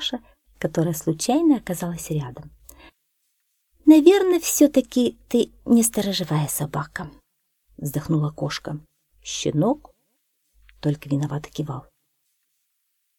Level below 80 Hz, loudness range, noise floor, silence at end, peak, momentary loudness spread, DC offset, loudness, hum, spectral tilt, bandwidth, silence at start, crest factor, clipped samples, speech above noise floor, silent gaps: -54 dBFS; 9 LU; -73 dBFS; 1.4 s; -2 dBFS; 17 LU; under 0.1%; -22 LUFS; none; -5.5 dB/octave; 19 kHz; 0 s; 22 dB; under 0.1%; 52 dB; none